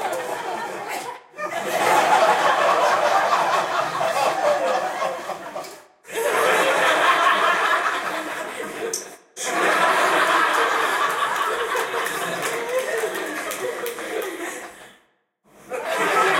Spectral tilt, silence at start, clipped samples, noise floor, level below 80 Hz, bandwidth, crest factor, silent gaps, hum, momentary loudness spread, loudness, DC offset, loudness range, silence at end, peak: -1.5 dB/octave; 0 s; under 0.1%; -63 dBFS; -70 dBFS; 16.5 kHz; 18 dB; none; none; 14 LU; -21 LUFS; under 0.1%; 7 LU; 0 s; -4 dBFS